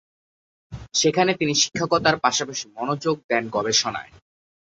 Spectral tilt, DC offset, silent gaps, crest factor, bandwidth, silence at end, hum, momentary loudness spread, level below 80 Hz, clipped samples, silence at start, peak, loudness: -2.5 dB/octave; under 0.1%; 3.24-3.29 s; 22 dB; 8 kHz; 0.7 s; none; 10 LU; -54 dBFS; under 0.1%; 0.7 s; -2 dBFS; -21 LUFS